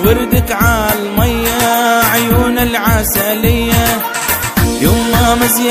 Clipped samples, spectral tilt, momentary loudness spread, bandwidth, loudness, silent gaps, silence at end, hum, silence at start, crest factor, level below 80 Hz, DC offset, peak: under 0.1%; -4.5 dB/octave; 4 LU; 16 kHz; -12 LUFS; none; 0 s; none; 0 s; 12 dB; -22 dBFS; under 0.1%; 0 dBFS